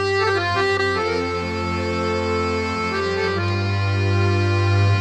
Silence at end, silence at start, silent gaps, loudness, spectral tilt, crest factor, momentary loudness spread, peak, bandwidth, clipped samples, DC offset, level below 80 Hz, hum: 0 s; 0 s; none; -21 LUFS; -6 dB/octave; 12 dB; 4 LU; -8 dBFS; 8.8 kHz; under 0.1%; under 0.1%; -44 dBFS; none